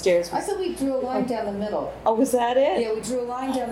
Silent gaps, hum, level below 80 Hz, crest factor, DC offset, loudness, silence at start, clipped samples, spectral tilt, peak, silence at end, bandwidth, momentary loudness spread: none; none; -52 dBFS; 16 dB; under 0.1%; -24 LUFS; 0 s; under 0.1%; -4.5 dB/octave; -8 dBFS; 0 s; 16 kHz; 7 LU